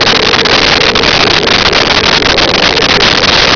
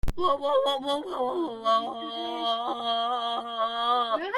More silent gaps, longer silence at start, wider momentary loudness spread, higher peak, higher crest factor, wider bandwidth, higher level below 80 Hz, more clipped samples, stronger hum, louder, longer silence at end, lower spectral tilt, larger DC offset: neither; about the same, 0 s vs 0.05 s; second, 1 LU vs 5 LU; first, 0 dBFS vs -12 dBFS; second, 8 dB vs 14 dB; second, 5.4 kHz vs 15.5 kHz; first, -26 dBFS vs -42 dBFS; neither; neither; first, -5 LUFS vs -27 LUFS; about the same, 0 s vs 0 s; second, -2.5 dB/octave vs -4.5 dB/octave; neither